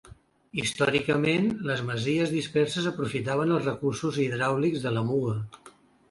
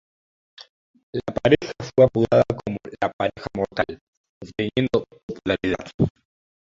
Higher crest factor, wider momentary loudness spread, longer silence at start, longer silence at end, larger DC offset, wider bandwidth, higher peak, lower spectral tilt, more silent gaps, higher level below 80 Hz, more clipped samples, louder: about the same, 18 dB vs 22 dB; second, 6 LU vs 13 LU; second, 0.05 s vs 0.6 s; second, 0.4 s vs 0.55 s; neither; first, 11.5 kHz vs 7.6 kHz; second, -10 dBFS vs -2 dBFS; second, -5.5 dB/octave vs -7 dB/octave; second, none vs 0.69-0.94 s, 1.03-1.13 s, 3.13-3.19 s, 4.01-4.41 s, 5.23-5.28 s, 5.94-5.99 s; second, -60 dBFS vs -48 dBFS; neither; second, -27 LUFS vs -23 LUFS